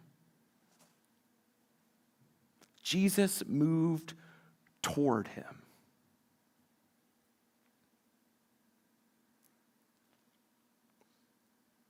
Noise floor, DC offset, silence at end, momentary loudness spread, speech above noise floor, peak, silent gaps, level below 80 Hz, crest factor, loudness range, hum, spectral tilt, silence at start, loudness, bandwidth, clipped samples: -75 dBFS; under 0.1%; 6.3 s; 18 LU; 43 dB; -16 dBFS; none; -78 dBFS; 22 dB; 7 LU; none; -5 dB/octave; 2.85 s; -32 LUFS; 19 kHz; under 0.1%